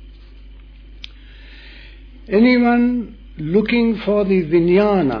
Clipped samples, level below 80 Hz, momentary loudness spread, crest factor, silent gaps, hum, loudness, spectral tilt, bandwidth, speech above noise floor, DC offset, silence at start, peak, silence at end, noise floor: under 0.1%; -40 dBFS; 23 LU; 14 dB; none; none; -16 LUFS; -9 dB/octave; 5.4 kHz; 24 dB; under 0.1%; 0 s; -4 dBFS; 0 s; -39 dBFS